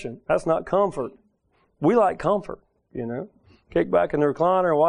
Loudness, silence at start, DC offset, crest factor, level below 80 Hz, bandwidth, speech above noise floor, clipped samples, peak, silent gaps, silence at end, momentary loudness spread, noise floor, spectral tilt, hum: -23 LUFS; 0 s; under 0.1%; 16 dB; -52 dBFS; 10.5 kHz; 44 dB; under 0.1%; -6 dBFS; none; 0 s; 16 LU; -66 dBFS; -7.5 dB/octave; none